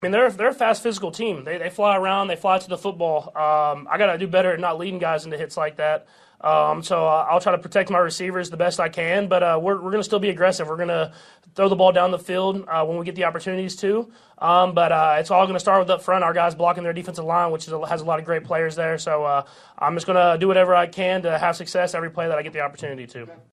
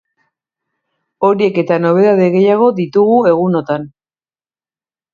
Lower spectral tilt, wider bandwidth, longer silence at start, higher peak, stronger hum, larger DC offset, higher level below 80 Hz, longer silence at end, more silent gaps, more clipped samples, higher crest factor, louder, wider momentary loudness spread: second, -5 dB/octave vs -9 dB/octave; first, 12.5 kHz vs 7 kHz; second, 0 s vs 1.2 s; second, -4 dBFS vs 0 dBFS; neither; neither; second, -66 dBFS vs -60 dBFS; second, 0.2 s vs 1.25 s; neither; neither; about the same, 18 dB vs 14 dB; second, -21 LUFS vs -12 LUFS; about the same, 9 LU vs 7 LU